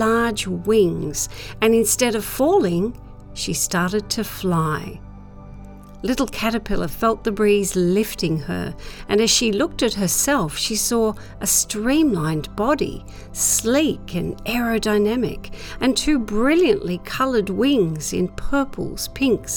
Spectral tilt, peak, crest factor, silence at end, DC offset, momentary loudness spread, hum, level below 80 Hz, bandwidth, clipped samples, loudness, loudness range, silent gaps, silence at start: -4 dB/octave; -4 dBFS; 16 dB; 0 s; under 0.1%; 10 LU; none; -38 dBFS; over 20 kHz; under 0.1%; -20 LUFS; 4 LU; none; 0 s